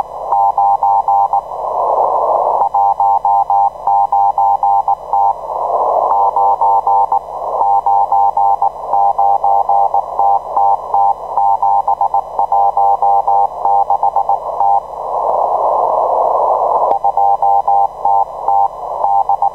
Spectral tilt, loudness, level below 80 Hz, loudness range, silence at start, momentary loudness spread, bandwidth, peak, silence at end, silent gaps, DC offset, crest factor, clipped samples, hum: -6 dB/octave; -13 LUFS; -50 dBFS; 1 LU; 0 s; 4 LU; 6.2 kHz; -2 dBFS; 0 s; none; 0.3%; 10 dB; under 0.1%; 60 Hz at -55 dBFS